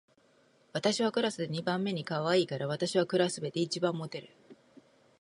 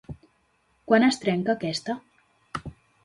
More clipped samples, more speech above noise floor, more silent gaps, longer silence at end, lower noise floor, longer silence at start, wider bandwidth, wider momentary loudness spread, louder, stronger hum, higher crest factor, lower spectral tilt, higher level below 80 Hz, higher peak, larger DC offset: neither; second, 35 dB vs 44 dB; neither; first, 0.7 s vs 0.3 s; about the same, -66 dBFS vs -67 dBFS; first, 0.75 s vs 0.1 s; about the same, 11.5 kHz vs 11.5 kHz; second, 7 LU vs 24 LU; second, -31 LUFS vs -24 LUFS; neither; about the same, 18 dB vs 20 dB; about the same, -5 dB/octave vs -5 dB/octave; second, -78 dBFS vs -56 dBFS; second, -14 dBFS vs -6 dBFS; neither